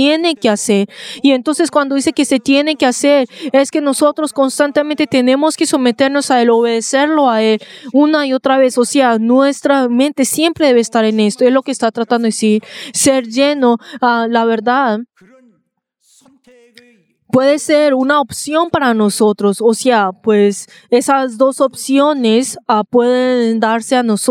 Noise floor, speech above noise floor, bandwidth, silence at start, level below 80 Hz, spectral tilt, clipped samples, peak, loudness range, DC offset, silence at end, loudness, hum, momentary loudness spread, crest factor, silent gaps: -64 dBFS; 52 dB; 16.5 kHz; 0 s; -60 dBFS; -4 dB/octave; under 0.1%; 0 dBFS; 4 LU; under 0.1%; 0 s; -13 LUFS; none; 4 LU; 12 dB; none